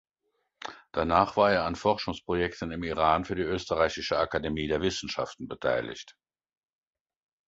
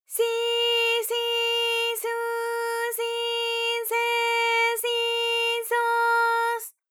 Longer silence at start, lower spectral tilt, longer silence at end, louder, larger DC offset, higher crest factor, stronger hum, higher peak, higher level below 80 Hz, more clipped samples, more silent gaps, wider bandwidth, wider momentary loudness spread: first, 0.6 s vs 0.1 s; first, -5 dB/octave vs 5 dB/octave; first, 1.35 s vs 0.2 s; second, -28 LUFS vs -24 LUFS; neither; first, 22 dB vs 12 dB; neither; first, -8 dBFS vs -12 dBFS; first, -50 dBFS vs under -90 dBFS; neither; neither; second, 8 kHz vs over 20 kHz; first, 11 LU vs 6 LU